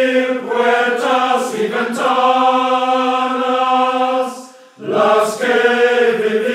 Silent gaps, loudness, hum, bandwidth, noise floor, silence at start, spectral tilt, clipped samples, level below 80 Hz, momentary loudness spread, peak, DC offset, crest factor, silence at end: none; -15 LUFS; none; 15 kHz; -36 dBFS; 0 s; -3.5 dB/octave; under 0.1%; -80 dBFS; 6 LU; 0 dBFS; under 0.1%; 14 dB; 0 s